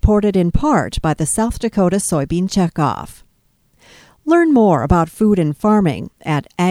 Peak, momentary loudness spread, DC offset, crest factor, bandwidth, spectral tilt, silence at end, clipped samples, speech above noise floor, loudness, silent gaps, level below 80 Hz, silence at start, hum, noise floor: 0 dBFS; 8 LU; under 0.1%; 16 dB; 15.5 kHz; -6 dB/octave; 0 s; under 0.1%; 44 dB; -16 LUFS; none; -28 dBFS; 0.05 s; none; -59 dBFS